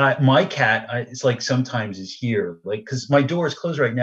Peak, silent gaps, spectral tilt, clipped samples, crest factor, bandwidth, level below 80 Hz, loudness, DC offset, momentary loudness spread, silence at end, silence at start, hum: -2 dBFS; none; -5.5 dB/octave; under 0.1%; 18 dB; 7.8 kHz; -66 dBFS; -21 LUFS; under 0.1%; 11 LU; 0 s; 0 s; none